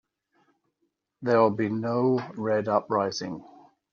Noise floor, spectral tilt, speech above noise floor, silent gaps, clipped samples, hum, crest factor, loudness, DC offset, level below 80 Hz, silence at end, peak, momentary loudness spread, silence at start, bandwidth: -77 dBFS; -5.5 dB/octave; 52 dB; none; under 0.1%; none; 20 dB; -26 LUFS; under 0.1%; -72 dBFS; 0.5 s; -8 dBFS; 12 LU; 1.2 s; 7.2 kHz